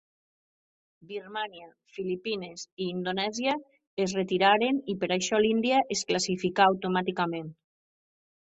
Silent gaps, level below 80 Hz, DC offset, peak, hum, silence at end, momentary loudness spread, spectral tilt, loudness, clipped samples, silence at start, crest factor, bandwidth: 2.72-2.77 s, 3.87-3.97 s; -68 dBFS; under 0.1%; -8 dBFS; none; 1.05 s; 14 LU; -4 dB/octave; -28 LUFS; under 0.1%; 1.1 s; 20 dB; 8.4 kHz